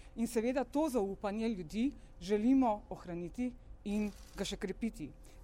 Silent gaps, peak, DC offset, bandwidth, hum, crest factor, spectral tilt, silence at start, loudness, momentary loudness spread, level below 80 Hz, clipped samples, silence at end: none; -22 dBFS; under 0.1%; 16.5 kHz; none; 14 dB; -6 dB/octave; 0 s; -36 LUFS; 13 LU; -54 dBFS; under 0.1%; 0 s